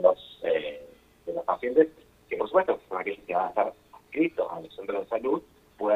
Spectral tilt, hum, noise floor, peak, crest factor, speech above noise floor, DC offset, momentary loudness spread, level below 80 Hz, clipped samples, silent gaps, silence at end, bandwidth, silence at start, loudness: -6.5 dB/octave; none; -50 dBFS; -6 dBFS; 22 dB; 23 dB; under 0.1%; 13 LU; -66 dBFS; under 0.1%; none; 0 s; 5 kHz; 0 s; -29 LUFS